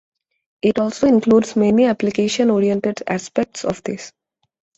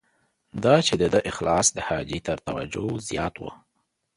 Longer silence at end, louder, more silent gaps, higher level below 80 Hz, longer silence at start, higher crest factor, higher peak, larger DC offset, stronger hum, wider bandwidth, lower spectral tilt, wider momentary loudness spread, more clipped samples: about the same, 0.7 s vs 0.6 s; first, -18 LUFS vs -24 LUFS; neither; second, -54 dBFS vs -48 dBFS; about the same, 0.65 s vs 0.55 s; second, 16 dB vs 22 dB; about the same, -2 dBFS vs -4 dBFS; neither; neither; second, 8.2 kHz vs 11.5 kHz; first, -5.5 dB/octave vs -4 dB/octave; about the same, 11 LU vs 12 LU; neither